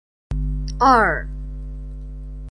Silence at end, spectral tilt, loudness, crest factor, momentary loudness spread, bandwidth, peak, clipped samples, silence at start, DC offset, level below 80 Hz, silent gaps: 0 s; -6 dB/octave; -19 LUFS; 20 dB; 21 LU; 10 kHz; -2 dBFS; under 0.1%; 0.3 s; under 0.1%; -28 dBFS; none